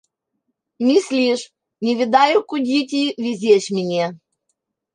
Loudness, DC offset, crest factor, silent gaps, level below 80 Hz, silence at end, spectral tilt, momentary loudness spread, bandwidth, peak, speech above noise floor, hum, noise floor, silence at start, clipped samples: -18 LUFS; under 0.1%; 18 dB; none; -70 dBFS; 0.8 s; -4.5 dB/octave; 9 LU; 10.5 kHz; -2 dBFS; 57 dB; none; -75 dBFS; 0.8 s; under 0.1%